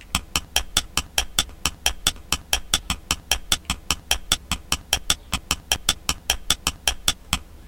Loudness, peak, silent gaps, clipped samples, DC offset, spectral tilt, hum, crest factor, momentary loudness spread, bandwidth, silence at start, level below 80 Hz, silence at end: -23 LUFS; -4 dBFS; none; under 0.1%; under 0.1%; -1 dB/octave; none; 22 dB; 4 LU; 17.5 kHz; 0 s; -36 dBFS; 0 s